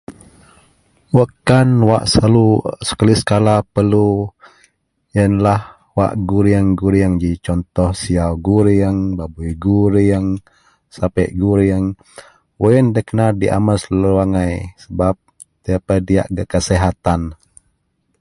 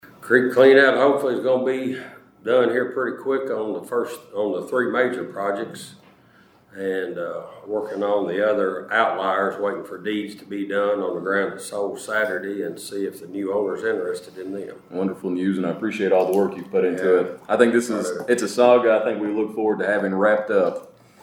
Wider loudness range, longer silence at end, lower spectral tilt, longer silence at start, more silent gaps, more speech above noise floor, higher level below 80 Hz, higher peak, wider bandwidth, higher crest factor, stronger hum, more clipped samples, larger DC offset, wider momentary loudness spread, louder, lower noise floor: second, 4 LU vs 7 LU; first, 0.85 s vs 0.3 s; first, -7 dB/octave vs -5 dB/octave; about the same, 0.1 s vs 0.05 s; neither; first, 51 dB vs 33 dB; first, -32 dBFS vs -74 dBFS; about the same, 0 dBFS vs -2 dBFS; second, 11.5 kHz vs 17.5 kHz; about the same, 16 dB vs 20 dB; neither; neither; neither; second, 9 LU vs 12 LU; first, -15 LUFS vs -22 LUFS; first, -66 dBFS vs -54 dBFS